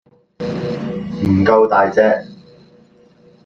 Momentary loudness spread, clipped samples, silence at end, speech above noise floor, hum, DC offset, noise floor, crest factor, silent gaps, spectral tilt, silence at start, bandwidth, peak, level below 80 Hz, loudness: 13 LU; under 0.1%; 1.1 s; 36 dB; none; under 0.1%; -49 dBFS; 16 dB; none; -8 dB/octave; 0.4 s; 7.4 kHz; -2 dBFS; -52 dBFS; -16 LUFS